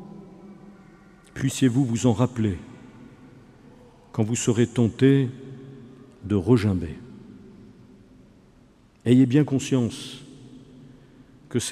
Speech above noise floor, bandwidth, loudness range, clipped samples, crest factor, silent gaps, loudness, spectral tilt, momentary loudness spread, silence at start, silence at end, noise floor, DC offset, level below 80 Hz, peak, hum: 34 dB; 13 kHz; 4 LU; under 0.1%; 20 dB; none; -23 LUFS; -6.5 dB/octave; 25 LU; 0 s; 0 s; -55 dBFS; under 0.1%; -54 dBFS; -6 dBFS; none